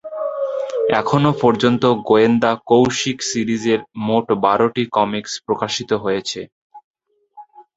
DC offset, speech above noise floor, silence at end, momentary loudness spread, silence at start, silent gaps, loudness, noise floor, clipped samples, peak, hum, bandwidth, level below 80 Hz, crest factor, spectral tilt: under 0.1%; 28 dB; 0.15 s; 9 LU; 0.05 s; 6.52-6.70 s, 6.84-6.94 s; -18 LUFS; -45 dBFS; under 0.1%; 0 dBFS; none; 8 kHz; -54 dBFS; 18 dB; -5 dB/octave